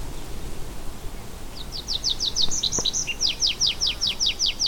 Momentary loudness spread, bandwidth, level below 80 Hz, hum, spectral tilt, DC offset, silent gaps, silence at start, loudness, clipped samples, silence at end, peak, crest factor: 18 LU; 18 kHz; -36 dBFS; none; -0.5 dB/octave; under 0.1%; none; 0 s; -22 LUFS; under 0.1%; 0 s; -8 dBFS; 18 dB